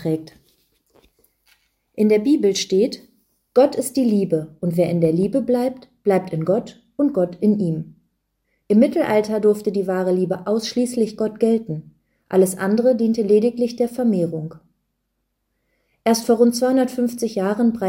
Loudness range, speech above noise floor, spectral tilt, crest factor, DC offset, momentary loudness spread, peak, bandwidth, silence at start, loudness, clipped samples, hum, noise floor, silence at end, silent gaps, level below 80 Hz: 3 LU; 55 dB; -6 dB/octave; 16 dB; under 0.1%; 8 LU; -4 dBFS; 16.5 kHz; 0 s; -19 LUFS; under 0.1%; none; -74 dBFS; 0 s; none; -60 dBFS